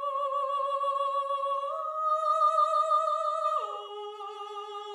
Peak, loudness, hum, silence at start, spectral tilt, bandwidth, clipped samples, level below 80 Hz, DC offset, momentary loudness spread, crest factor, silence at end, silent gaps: -16 dBFS; -28 LUFS; none; 0 s; 1 dB/octave; 11 kHz; under 0.1%; under -90 dBFS; under 0.1%; 14 LU; 14 dB; 0 s; none